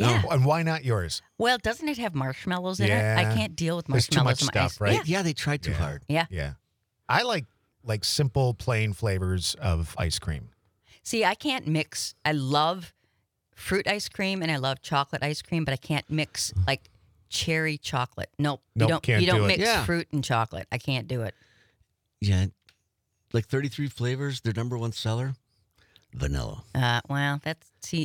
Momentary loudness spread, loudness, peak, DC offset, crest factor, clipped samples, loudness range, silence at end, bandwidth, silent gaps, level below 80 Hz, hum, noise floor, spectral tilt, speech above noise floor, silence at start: 10 LU; -27 LUFS; -6 dBFS; under 0.1%; 22 dB; under 0.1%; 6 LU; 0 s; 19 kHz; none; -48 dBFS; none; -76 dBFS; -5 dB/octave; 50 dB; 0 s